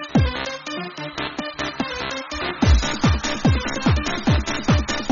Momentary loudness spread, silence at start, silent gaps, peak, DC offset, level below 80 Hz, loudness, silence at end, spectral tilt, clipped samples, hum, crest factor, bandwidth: 9 LU; 0 s; none; -4 dBFS; under 0.1%; -28 dBFS; -22 LUFS; 0 s; -4.5 dB/octave; under 0.1%; none; 16 dB; 7.4 kHz